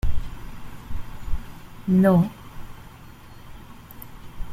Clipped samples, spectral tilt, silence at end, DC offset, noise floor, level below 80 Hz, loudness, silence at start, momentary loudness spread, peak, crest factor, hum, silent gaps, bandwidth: under 0.1%; -8.5 dB/octave; 0 s; under 0.1%; -43 dBFS; -34 dBFS; -23 LUFS; 0.05 s; 27 LU; -6 dBFS; 18 dB; none; none; 15.5 kHz